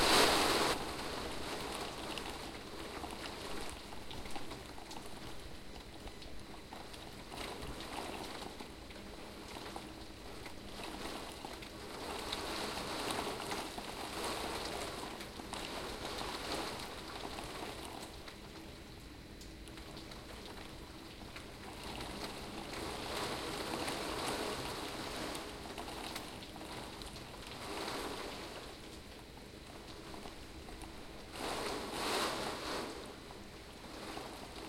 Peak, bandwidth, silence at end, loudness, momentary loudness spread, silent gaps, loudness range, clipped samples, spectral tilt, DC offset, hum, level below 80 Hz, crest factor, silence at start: -16 dBFS; 16.5 kHz; 0 s; -42 LUFS; 12 LU; none; 8 LU; under 0.1%; -3 dB/octave; under 0.1%; none; -56 dBFS; 26 dB; 0 s